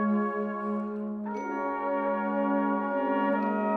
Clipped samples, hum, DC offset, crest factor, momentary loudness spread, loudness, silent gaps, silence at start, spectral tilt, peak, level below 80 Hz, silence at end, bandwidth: under 0.1%; none; under 0.1%; 14 dB; 7 LU; -29 LUFS; none; 0 s; -8.5 dB/octave; -14 dBFS; -70 dBFS; 0 s; 6.4 kHz